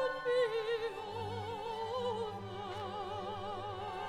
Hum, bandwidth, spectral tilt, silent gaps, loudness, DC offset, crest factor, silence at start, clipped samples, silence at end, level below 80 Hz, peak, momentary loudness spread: none; 13.5 kHz; -5 dB/octave; none; -38 LUFS; under 0.1%; 16 dB; 0 s; under 0.1%; 0 s; -64 dBFS; -22 dBFS; 9 LU